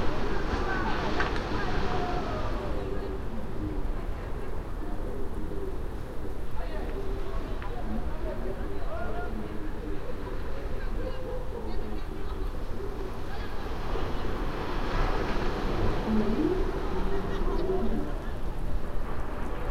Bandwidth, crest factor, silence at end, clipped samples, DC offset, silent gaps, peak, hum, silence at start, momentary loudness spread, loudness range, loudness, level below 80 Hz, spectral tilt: 7.2 kHz; 18 dB; 0 s; under 0.1%; under 0.1%; none; -10 dBFS; none; 0 s; 8 LU; 7 LU; -34 LUFS; -32 dBFS; -7 dB/octave